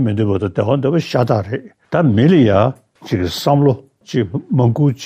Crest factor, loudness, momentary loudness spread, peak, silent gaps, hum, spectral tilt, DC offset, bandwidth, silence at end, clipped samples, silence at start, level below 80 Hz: 14 dB; -16 LUFS; 11 LU; -2 dBFS; none; none; -7.5 dB/octave; under 0.1%; 15.5 kHz; 0 s; under 0.1%; 0 s; -52 dBFS